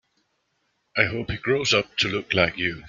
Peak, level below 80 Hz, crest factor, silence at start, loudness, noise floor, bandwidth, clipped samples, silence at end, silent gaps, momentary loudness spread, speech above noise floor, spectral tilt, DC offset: -2 dBFS; -52 dBFS; 24 dB; 0.95 s; -23 LUFS; -72 dBFS; 9.4 kHz; under 0.1%; 0 s; none; 5 LU; 48 dB; -4 dB/octave; under 0.1%